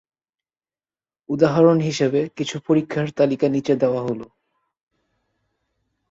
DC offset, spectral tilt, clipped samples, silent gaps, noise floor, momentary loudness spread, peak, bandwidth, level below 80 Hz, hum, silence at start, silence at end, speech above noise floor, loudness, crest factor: under 0.1%; -6.5 dB/octave; under 0.1%; none; under -90 dBFS; 12 LU; -2 dBFS; 8 kHz; -62 dBFS; none; 1.3 s; 1.85 s; over 71 dB; -20 LUFS; 20 dB